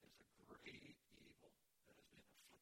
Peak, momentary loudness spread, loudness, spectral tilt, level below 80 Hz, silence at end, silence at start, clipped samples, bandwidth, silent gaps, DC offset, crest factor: -44 dBFS; 9 LU; -63 LUFS; -3.5 dB/octave; -86 dBFS; 0 s; 0 s; under 0.1%; 16.5 kHz; none; under 0.1%; 22 dB